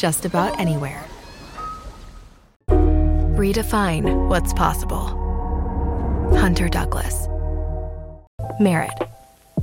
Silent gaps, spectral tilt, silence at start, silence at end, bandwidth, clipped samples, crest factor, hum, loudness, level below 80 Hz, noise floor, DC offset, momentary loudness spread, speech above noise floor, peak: 2.56-2.60 s, 8.27-8.38 s; -6 dB/octave; 0 s; 0 s; 17 kHz; under 0.1%; 16 dB; none; -21 LUFS; -24 dBFS; -42 dBFS; under 0.1%; 16 LU; 23 dB; -4 dBFS